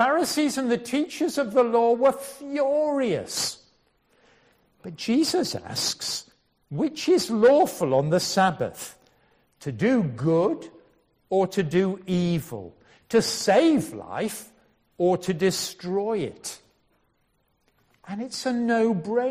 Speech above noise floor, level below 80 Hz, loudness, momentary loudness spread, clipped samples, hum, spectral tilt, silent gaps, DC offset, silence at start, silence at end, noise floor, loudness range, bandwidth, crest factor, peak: 46 dB; -64 dBFS; -24 LUFS; 16 LU; under 0.1%; none; -4.5 dB/octave; none; under 0.1%; 0 s; 0 s; -69 dBFS; 6 LU; 15.5 kHz; 18 dB; -8 dBFS